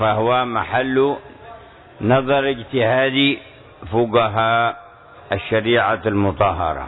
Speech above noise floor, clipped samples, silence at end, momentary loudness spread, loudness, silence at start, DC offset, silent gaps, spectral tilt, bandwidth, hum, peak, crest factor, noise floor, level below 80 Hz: 23 dB; under 0.1%; 0 s; 8 LU; -18 LUFS; 0 s; under 0.1%; none; -9 dB/octave; 4.1 kHz; none; -4 dBFS; 16 dB; -41 dBFS; -46 dBFS